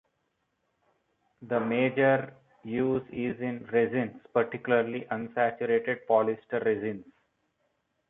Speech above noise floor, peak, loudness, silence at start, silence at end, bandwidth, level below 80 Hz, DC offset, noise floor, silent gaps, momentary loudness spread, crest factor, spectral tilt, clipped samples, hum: 49 dB; -10 dBFS; -29 LUFS; 1.4 s; 1.05 s; 3.9 kHz; -68 dBFS; under 0.1%; -77 dBFS; none; 9 LU; 20 dB; -10 dB/octave; under 0.1%; none